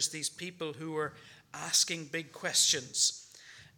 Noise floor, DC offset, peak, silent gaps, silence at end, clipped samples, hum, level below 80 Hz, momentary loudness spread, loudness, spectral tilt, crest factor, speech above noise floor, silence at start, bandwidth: -55 dBFS; under 0.1%; -12 dBFS; none; 0.15 s; under 0.1%; none; -80 dBFS; 16 LU; -30 LUFS; -0.5 dB/octave; 22 dB; 21 dB; 0 s; 19 kHz